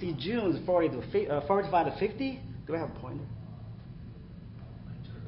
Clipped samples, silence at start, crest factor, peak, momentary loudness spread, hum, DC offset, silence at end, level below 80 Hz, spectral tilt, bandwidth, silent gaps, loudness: under 0.1%; 0 s; 18 dB; -14 dBFS; 19 LU; none; under 0.1%; 0 s; -54 dBFS; -10.5 dB/octave; 5.8 kHz; none; -31 LUFS